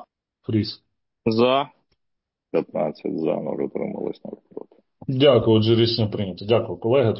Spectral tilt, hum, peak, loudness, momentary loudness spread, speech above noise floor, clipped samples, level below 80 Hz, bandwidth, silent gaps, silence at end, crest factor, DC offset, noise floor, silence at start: -11 dB/octave; none; -4 dBFS; -22 LUFS; 20 LU; 58 dB; under 0.1%; -54 dBFS; 5.8 kHz; none; 0 s; 18 dB; under 0.1%; -79 dBFS; 0.5 s